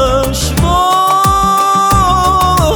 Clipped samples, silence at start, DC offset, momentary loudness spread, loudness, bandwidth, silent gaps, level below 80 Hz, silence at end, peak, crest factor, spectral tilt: under 0.1%; 0 s; under 0.1%; 3 LU; -10 LUFS; over 20 kHz; none; -22 dBFS; 0 s; 0 dBFS; 10 dB; -4.5 dB/octave